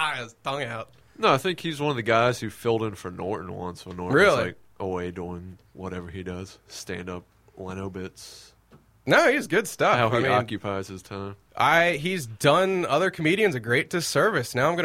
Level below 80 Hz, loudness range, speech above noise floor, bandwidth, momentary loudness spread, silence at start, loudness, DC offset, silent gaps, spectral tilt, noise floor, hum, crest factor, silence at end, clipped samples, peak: -58 dBFS; 13 LU; 32 dB; 16.5 kHz; 18 LU; 0 s; -24 LUFS; under 0.1%; none; -4.5 dB/octave; -57 dBFS; none; 20 dB; 0 s; under 0.1%; -4 dBFS